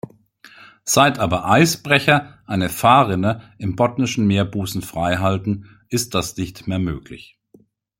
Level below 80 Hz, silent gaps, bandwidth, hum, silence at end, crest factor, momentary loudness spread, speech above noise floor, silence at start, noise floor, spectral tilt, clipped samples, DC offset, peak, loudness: -48 dBFS; none; 16.5 kHz; none; 0.8 s; 18 dB; 13 LU; 36 dB; 0.6 s; -54 dBFS; -4.5 dB/octave; under 0.1%; under 0.1%; -2 dBFS; -19 LUFS